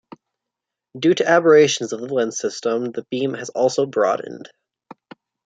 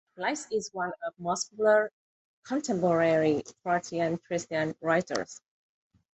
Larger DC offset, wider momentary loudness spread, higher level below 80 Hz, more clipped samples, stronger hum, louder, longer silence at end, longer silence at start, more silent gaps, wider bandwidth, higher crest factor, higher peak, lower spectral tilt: neither; about the same, 12 LU vs 10 LU; about the same, -70 dBFS vs -70 dBFS; neither; neither; first, -19 LUFS vs -29 LUFS; first, 1 s vs 0.75 s; first, 0.95 s vs 0.15 s; second, none vs 1.93-2.43 s; about the same, 9 kHz vs 8.4 kHz; about the same, 20 dB vs 18 dB; first, 0 dBFS vs -12 dBFS; about the same, -4 dB/octave vs -4.5 dB/octave